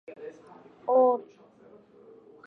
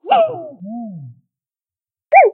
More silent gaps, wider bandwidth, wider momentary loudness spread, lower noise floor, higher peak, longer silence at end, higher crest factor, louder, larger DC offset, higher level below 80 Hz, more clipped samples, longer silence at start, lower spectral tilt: neither; second, 2.9 kHz vs 4 kHz; about the same, 22 LU vs 20 LU; second, -55 dBFS vs under -90 dBFS; second, -12 dBFS vs 0 dBFS; first, 1.25 s vs 0 s; about the same, 18 dB vs 16 dB; second, -25 LUFS vs -14 LUFS; neither; second, -84 dBFS vs -78 dBFS; neither; about the same, 0.1 s vs 0.05 s; about the same, -8 dB/octave vs -9 dB/octave